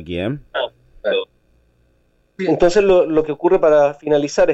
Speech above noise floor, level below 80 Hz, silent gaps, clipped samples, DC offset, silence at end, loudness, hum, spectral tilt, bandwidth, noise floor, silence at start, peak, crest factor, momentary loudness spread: 44 dB; -42 dBFS; none; under 0.1%; under 0.1%; 0 s; -17 LUFS; none; -5.5 dB/octave; 8.2 kHz; -60 dBFS; 0 s; -4 dBFS; 12 dB; 12 LU